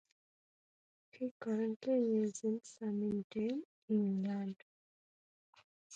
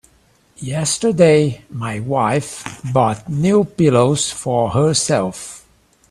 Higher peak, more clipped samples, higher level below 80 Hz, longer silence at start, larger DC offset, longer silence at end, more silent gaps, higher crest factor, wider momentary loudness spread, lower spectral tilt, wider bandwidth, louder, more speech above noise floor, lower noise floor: second, -26 dBFS vs 0 dBFS; neither; second, -82 dBFS vs -50 dBFS; first, 1.15 s vs 0.6 s; neither; second, 0 s vs 0.5 s; first, 1.31-1.40 s, 1.76-1.80 s, 3.24-3.30 s, 3.65-3.88 s, 4.62-5.53 s, 5.64-5.90 s vs none; about the same, 14 dB vs 18 dB; second, 10 LU vs 14 LU; first, -7 dB/octave vs -5 dB/octave; second, 9.2 kHz vs 14.5 kHz; second, -38 LUFS vs -17 LUFS; first, over 53 dB vs 39 dB; first, under -90 dBFS vs -55 dBFS